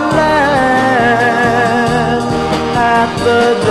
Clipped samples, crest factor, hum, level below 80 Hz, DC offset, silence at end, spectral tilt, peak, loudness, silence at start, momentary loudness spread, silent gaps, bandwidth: under 0.1%; 12 dB; none; -34 dBFS; under 0.1%; 0 s; -5.5 dB/octave; 0 dBFS; -11 LUFS; 0 s; 4 LU; none; 13 kHz